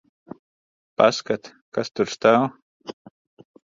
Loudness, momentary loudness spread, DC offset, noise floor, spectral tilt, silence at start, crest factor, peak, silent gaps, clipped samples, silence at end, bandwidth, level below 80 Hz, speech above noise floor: -22 LUFS; 22 LU; under 0.1%; under -90 dBFS; -4.5 dB/octave; 1 s; 24 dB; -2 dBFS; 1.61-1.72 s, 2.62-2.80 s; under 0.1%; 0.75 s; 7.6 kHz; -64 dBFS; over 70 dB